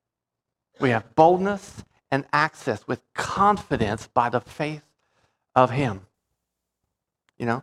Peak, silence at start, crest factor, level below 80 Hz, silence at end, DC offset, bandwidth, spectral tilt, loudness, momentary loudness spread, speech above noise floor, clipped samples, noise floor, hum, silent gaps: -2 dBFS; 0.8 s; 22 dB; -54 dBFS; 0 s; under 0.1%; 13 kHz; -6 dB/octave; -23 LUFS; 13 LU; 63 dB; under 0.1%; -85 dBFS; none; none